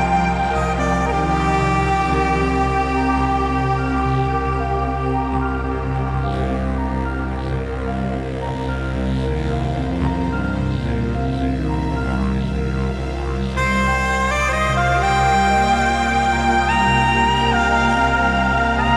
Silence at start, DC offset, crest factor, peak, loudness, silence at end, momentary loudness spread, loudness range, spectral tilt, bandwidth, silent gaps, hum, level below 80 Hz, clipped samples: 0 s; under 0.1%; 14 dB; -4 dBFS; -19 LUFS; 0 s; 7 LU; 6 LU; -6 dB/octave; 11.5 kHz; none; none; -26 dBFS; under 0.1%